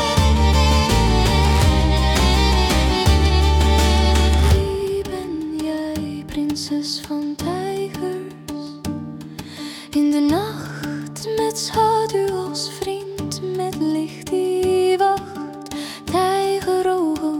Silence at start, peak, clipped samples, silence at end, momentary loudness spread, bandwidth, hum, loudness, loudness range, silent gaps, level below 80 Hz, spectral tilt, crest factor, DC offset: 0 s; -4 dBFS; under 0.1%; 0 s; 13 LU; 17 kHz; none; -19 LUFS; 9 LU; none; -24 dBFS; -5.5 dB/octave; 16 dB; under 0.1%